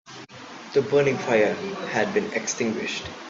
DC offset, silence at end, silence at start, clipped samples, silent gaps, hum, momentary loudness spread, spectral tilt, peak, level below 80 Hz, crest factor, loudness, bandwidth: under 0.1%; 0 s; 0.05 s; under 0.1%; none; none; 19 LU; -4 dB/octave; -6 dBFS; -62 dBFS; 18 dB; -24 LUFS; 7.8 kHz